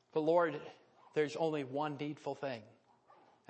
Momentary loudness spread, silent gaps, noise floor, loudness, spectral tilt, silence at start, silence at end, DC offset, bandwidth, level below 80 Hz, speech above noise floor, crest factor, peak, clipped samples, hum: 14 LU; none; -66 dBFS; -37 LUFS; -6.5 dB/octave; 0.15 s; 0.8 s; under 0.1%; 8.4 kHz; -88 dBFS; 30 dB; 20 dB; -18 dBFS; under 0.1%; none